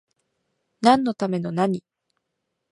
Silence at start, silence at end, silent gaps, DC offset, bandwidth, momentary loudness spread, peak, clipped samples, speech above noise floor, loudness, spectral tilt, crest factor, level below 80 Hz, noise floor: 0.8 s; 0.95 s; none; under 0.1%; 11.5 kHz; 8 LU; -4 dBFS; under 0.1%; 58 dB; -22 LUFS; -6.5 dB/octave; 22 dB; -64 dBFS; -79 dBFS